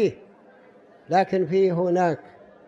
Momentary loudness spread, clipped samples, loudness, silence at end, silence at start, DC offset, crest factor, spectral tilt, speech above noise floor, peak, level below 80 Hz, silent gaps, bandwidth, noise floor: 5 LU; under 0.1%; -23 LUFS; 0.45 s; 0 s; under 0.1%; 14 dB; -7.5 dB/octave; 31 dB; -10 dBFS; -68 dBFS; none; 7.6 kHz; -52 dBFS